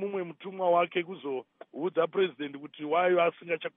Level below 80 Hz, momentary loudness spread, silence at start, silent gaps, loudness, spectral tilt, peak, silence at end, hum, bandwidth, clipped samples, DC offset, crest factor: under -90 dBFS; 14 LU; 0 s; none; -30 LUFS; -3.5 dB/octave; -14 dBFS; 0.05 s; none; 3.8 kHz; under 0.1%; under 0.1%; 16 dB